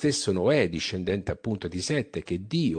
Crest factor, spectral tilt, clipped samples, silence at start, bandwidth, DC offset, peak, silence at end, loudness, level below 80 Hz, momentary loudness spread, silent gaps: 18 dB; -5 dB/octave; under 0.1%; 0 s; 10.5 kHz; under 0.1%; -8 dBFS; 0 s; -27 LUFS; -52 dBFS; 8 LU; none